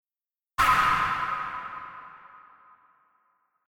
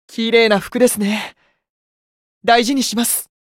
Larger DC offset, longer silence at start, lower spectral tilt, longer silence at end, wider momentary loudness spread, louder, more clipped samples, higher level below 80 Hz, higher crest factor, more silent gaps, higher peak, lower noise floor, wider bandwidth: neither; first, 0.6 s vs 0.1 s; about the same, -2.5 dB/octave vs -3 dB/octave; first, 1.3 s vs 0.2 s; first, 22 LU vs 10 LU; second, -25 LUFS vs -16 LUFS; neither; about the same, -52 dBFS vs -56 dBFS; first, 22 dB vs 16 dB; second, none vs 1.69-2.41 s; second, -8 dBFS vs 0 dBFS; about the same, under -90 dBFS vs under -90 dBFS; about the same, 16.5 kHz vs 17 kHz